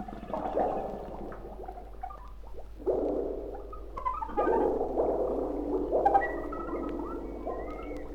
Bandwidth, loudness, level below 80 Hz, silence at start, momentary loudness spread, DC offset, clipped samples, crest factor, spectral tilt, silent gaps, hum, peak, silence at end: 17.5 kHz; -32 LUFS; -44 dBFS; 0 s; 16 LU; under 0.1%; under 0.1%; 20 dB; -8.5 dB/octave; none; none; -12 dBFS; 0 s